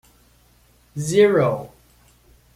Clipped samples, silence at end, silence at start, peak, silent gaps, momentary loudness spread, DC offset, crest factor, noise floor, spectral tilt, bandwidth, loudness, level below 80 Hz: under 0.1%; 0.9 s; 0.95 s; -4 dBFS; none; 21 LU; under 0.1%; 18 dB; -56 dBFS; -5.5 dB/octave; 14.5 kHz; -19 LUFS; -56 dBFS